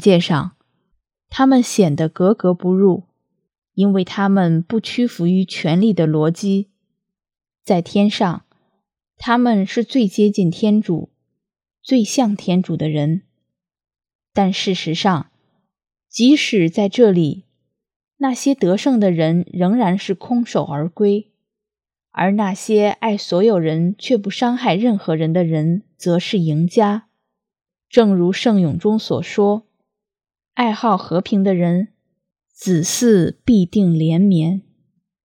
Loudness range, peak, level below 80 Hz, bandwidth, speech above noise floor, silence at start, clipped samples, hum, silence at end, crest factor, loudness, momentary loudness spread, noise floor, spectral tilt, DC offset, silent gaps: 3 LU; 0 dBFS; -56 dBFS; 14.5 kHz; 73 dB; 0 s; under 0.1%; none; 0.65 s; 18 dB; -17 LUFS; 8 LU; -88 dBFS; -6.5 dB/octave; under 0.1%; 14.15-14.19 s, 17.96-18.00 s